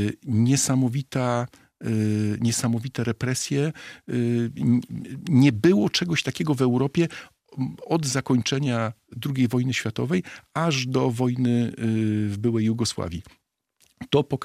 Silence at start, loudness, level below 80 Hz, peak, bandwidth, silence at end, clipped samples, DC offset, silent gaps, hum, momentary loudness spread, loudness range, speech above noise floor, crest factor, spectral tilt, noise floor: 0 s; -24 LUFS; -60 dBFS; -6 dBFS; 15 kHz; 0 s; under 0.1%; under 0.1%; none; none; 12 LU; 3 LU; 42 dB; 18 dB; -5.5 dB/octave; -65 dBFS